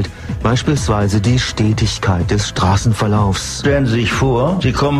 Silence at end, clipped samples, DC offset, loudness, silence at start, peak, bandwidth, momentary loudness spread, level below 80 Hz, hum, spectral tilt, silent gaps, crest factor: 0 s; under 0.1%; under 0.1%; -15 LUFS; 0 s; -2 dBFS; 13 kHz; 3 LU; -28 dBFS; none; -5.5 dB/octave; none; 14 dB